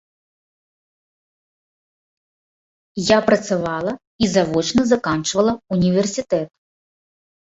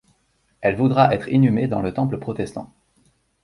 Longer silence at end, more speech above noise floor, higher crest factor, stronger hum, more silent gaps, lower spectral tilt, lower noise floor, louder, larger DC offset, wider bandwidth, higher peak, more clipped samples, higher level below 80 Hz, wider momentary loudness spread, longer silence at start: first, 1.1 s vs 0.8 s; first, over 72 dB vs 46 dB; about the same, 20 dB vs 20 dB; neither; first, 4.07-4.19 s vs none; second, -5 dB/octave vs -8.5 dB/octave; first, under -90 dBFS vs -65 dBFS; about the same, -19 LUFS vs -20 LUFS; neither; second, 8.2 kHz vs 11.5 kHz; about the same, -2 dBFS vs -2 dBFS; neither; about the same, -50 dBFS vs -50 dBFS; second, 8 LU vs 12 LU; first, 2.95 s vs 0.6 s